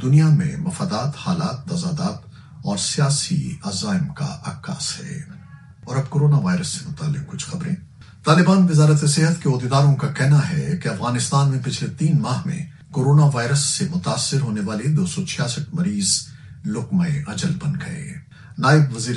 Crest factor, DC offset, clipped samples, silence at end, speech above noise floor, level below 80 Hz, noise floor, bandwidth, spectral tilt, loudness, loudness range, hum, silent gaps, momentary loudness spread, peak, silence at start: 20 dB; under 0.1%; under 0.1%; 0 s; 23 dB; -52 dBFS; -42 dBFS; 11.5 kHz; -5.5 dB/octave; -20 LUFS; 6 LU; none; none; 13 LU; 0 dBFS; 0 s